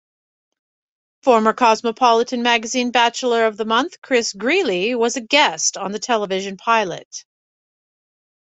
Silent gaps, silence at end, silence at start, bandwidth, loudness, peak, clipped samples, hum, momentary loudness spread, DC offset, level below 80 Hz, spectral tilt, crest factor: 3.98-4.02 s, 7.05-7.11 s; 1.2 s; 1.25 s; 8.4 kHz; -18 LUFS; -2 dBFS; under 0.1%; none; 8 LU; under 0.1%; -66 dBFS; -2 dB/octave; 18 dB